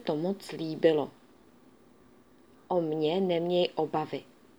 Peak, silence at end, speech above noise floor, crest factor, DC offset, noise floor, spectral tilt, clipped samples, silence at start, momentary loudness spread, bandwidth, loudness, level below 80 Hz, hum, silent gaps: -10 dBFS; 0.35 s; 30 dB; 20 dB; under 0.1%; -59 dBFS; -7 dB/octave; under 0.1%; 0 s; 11 LU; over 20 kHz; -30 LUFS; -76 dBFS; none; none